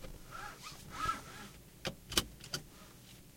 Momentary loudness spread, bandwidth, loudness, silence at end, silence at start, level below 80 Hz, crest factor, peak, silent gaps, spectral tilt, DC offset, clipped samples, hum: 20 LU; 16.5 kHz; -41 LUFS; 0 s; 0 s; -56 dBFS; 34 dB; -10 dBFS; none; -2 dB/octave; under 0.1%; under 0.1%; none